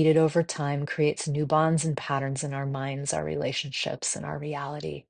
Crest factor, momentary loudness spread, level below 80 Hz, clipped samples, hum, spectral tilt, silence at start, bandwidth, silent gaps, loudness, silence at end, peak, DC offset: 18 dB; 9 LU; -62 dBFS; under 0.1%; none; -5 dB/octave; 0 s; 10 kHz; none; -28 LUFS; 0.1 s; -10 dBFS; under 0.1%